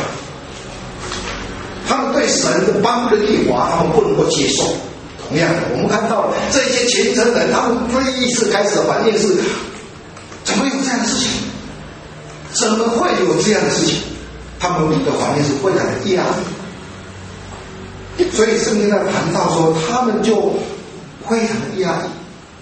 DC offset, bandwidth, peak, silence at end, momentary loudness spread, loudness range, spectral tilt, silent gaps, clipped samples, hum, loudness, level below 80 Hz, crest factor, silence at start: under 0.1%; 8.8 kHz; 0 dBFS; 0 s; 18 LU; 4 LU; -4 dB/octave; none; under 0.1%; none; -16 LUFS; -42 dBFS; 16 dB; 0 s